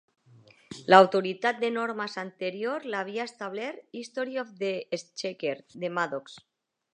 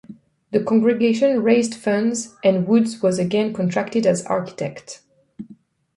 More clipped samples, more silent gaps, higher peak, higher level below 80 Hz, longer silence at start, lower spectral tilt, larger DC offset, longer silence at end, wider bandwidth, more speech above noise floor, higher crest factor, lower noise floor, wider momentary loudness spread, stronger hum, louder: neither; neither; about the same, -2 dBFS vs -4 dBFS; second, -80 dBFS vs -64 dBFS; first, 0.7 s vs 0.1 s; second, -4.5 dB/octave vs -6 dB/octave; neither; about the same, 0.55 s vs 0.45 s; second, 10 kHz vs 11.5 kHz; about the same, 29 dB vs 30 dB; first, 28 dB vs 16 dB; first, -57 dBFS vs -49 dBFS; second, 17 LU vs 22 LU; neither; second, -28 LUFS vs -20 LUFS